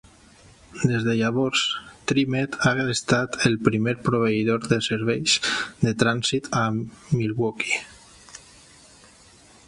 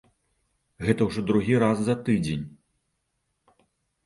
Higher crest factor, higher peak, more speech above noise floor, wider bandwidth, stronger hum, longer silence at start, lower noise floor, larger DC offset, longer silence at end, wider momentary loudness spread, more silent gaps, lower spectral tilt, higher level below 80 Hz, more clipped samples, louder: about the same, 22 dB vs 22 dB; first, -2 dBFS vs -6 dBFS; second, 29 dB vs 53 dB; about the same, 11.5 kHz vs 11.5 kHz; neither; about the same, 0.7 s vs 0.8 s; second, -52 dBFS vs -77 dBFS; neither; second, 1.3 s vs 1.55 s; about the same, 7 LU vs 9 LU; neither; second, -4.5 dB/octave vs -7 dB/octave; about the same, -54 dBFS vs -54 dBFS; neither; about the same, -23 LUFS vs -25 LUFS